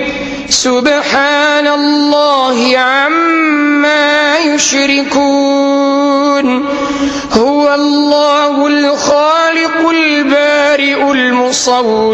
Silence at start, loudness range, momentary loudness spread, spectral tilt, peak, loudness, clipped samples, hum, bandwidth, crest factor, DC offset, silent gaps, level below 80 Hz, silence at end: 0 s; 1 LU; 2 LU; -2 dB/octave; 0 dBFS; -10 LUFS; under 0.1%; none; 11 kHz; 10 dB; under 0.1%; none; -46 dBFS; 0 s